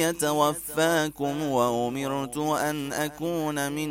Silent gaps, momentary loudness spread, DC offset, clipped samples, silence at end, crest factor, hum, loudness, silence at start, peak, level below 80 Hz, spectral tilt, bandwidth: none; 5 LU; under 0.1%; under 0.1%; 0 s; 18 dB; none; -26 LUFS; 0 s; -8 dBFS; -58 dBFS; -4 dB/octave; 16.5 kHz